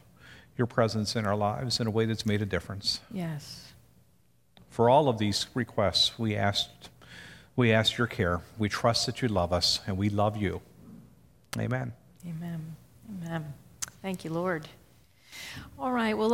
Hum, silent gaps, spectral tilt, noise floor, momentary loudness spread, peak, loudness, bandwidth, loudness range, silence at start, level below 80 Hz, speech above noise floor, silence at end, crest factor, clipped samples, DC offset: none; none; -5 dB/octave; -66 dBFS; 19 LU; -10 dBFS; -29 LUFS; 16.5 kHz; 10 LU; 0.25 s; -56 dBFS; 38 dB; 0 s; 20 dB; under 0.1%; under 0.1%